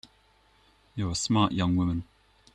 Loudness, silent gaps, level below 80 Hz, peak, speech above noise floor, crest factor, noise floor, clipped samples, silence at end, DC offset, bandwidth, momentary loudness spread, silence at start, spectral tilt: -27 LUFS; none; -52 dBFS; -10 dBFS; 37 dB; 18 dB; -63 dBFS; under 0.1%; 0.5 s; under 0.1%; 11 kHz; 10 LU; 0.95 s; -5 dB/octave